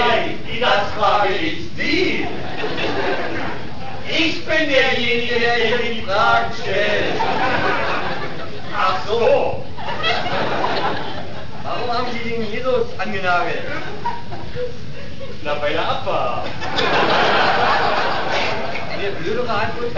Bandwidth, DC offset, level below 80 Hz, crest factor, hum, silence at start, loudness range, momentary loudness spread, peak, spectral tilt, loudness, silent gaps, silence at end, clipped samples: 6 kHz; 9%; -46 dBFS; 18 dB; none; 0 s; 6 LU; 12 LU; -2 dBFS; -4.5 dB/octave; -19 LUFS; none; 0 s; under 0.1%